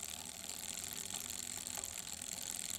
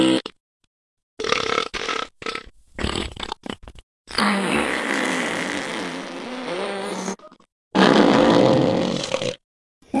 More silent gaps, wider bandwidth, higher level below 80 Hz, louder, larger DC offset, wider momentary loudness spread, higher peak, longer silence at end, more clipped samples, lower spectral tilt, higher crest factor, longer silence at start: second, none vs 0.40-0.60 s, 0.67-0.97 s, 1.03-1.17 s, 3.83-4.05 s, 7.52-7.71 s, 9.44-9.81 s; first, over 20 kHz vs 12 kHz; second, -68 dBFS vs -46 dBFS; second, -42 LUFS vs -22 LUFS; neither; second, 3 LU vs 16 LU; second, -22 dBFS vs 0 dBFS; about the same, 0 s vs 0 s; neither; second, 0 dB/octave vs -4.5 dB/octave; about the same, 24 dB vs 22 dB; about the same, 0 s vs 0 s